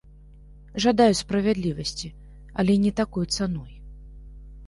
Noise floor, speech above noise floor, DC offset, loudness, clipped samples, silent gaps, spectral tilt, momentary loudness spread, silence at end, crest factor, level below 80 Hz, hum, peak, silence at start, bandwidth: -47 dBFS; 25 dB; under 0.1%; -23 LUFS; under 0.1%; none; -5.5 dB/octave; 16 LU; 0 s; 20 dB; -44 dBFS; none; -6 dBFS; 0.55 s; 11.5 kHz